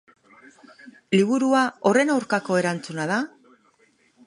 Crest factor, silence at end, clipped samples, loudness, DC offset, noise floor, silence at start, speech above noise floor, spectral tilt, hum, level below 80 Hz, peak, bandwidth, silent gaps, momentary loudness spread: 18 dB; 1 s; under 0.1%; -22 LUFS; under 0.1%; -62 dBFS; 0.85 s; 41 dB; -5.5 dB/octave; none; -72 dBFS; -6 dBFS; 11 kHz; none; 7 LU